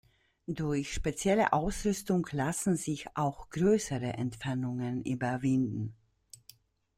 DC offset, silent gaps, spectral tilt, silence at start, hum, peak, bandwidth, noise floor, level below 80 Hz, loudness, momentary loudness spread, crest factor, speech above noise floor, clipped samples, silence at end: under 0.1%; none; -5.5 dB/octave; 0.5 s; none; -12 dBFS; 16 kHz; -61 dBFS; -50 dBFS; -32 LUFS; 9 LU; 20 dB; 30 dB; under 0.1%; 1.05 s